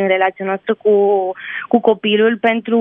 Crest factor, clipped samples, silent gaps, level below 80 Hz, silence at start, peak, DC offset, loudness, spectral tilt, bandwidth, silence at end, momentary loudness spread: 14 dB; under 0.1%; none; -66 dBFS; 0 s; 0 dBFS; under 0.1%; -16 LUFS; -8 dB/octave; 3.8 kHz; 0 s; 7 LU